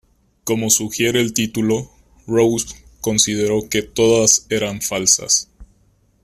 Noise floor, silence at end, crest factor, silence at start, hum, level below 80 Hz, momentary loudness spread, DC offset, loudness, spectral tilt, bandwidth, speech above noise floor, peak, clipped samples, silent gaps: -58 dBFS; 0.6 s; 18 dB; 0.45 s; none; -48 dBFS; 10 LU; under 0.1%; -17 LUFS; -3 dB/octave; 16 kHz; 40 dB; 0 dBFS; under 0.1%; none